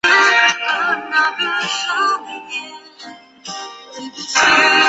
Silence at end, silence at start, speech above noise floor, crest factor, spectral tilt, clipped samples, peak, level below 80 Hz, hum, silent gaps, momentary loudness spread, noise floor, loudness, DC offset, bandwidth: 0 s; 0.05 s; 17 dB; 16 dB; 0 dB/octave; under 0.1%; 0 dBFS; -62 dBFS; none; none; 24 LU; -38 dBFS; -15 LUFS; under 0.1%; 8.2 kHz